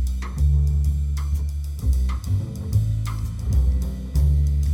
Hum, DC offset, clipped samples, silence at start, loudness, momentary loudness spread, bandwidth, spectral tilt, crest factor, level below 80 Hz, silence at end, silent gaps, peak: none; under 0.1%; under 0.1%; 0 s; -23 LUFS; 6 LU; 14 kHz; -7.5 dB/octave; 12 dB; -22 dBFS; 0 s; none; -10 dBFS